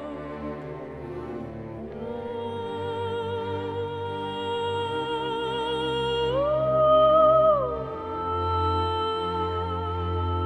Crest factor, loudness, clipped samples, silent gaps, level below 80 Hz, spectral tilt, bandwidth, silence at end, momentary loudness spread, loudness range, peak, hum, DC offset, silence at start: 16 dB; -26 LUFS; under 0.1%; none; -46 dBFS; -7 dB/octave; 9.4 kHz; 0 s; 17 LU; 10 LU; -10 dBFS; none; under 0.1%; 0 s